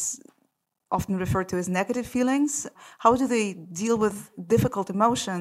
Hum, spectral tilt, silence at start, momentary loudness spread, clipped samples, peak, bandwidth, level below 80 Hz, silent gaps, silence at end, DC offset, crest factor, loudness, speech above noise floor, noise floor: none; -5 dB/octave; 0 s; 8 LU; under 0.1%; -4 dBFS; 16 kHz; -52 dBFS; none; 0 s; under 0.1%; 22 dB; -25 LUFS; 48 dB; -73 dBFS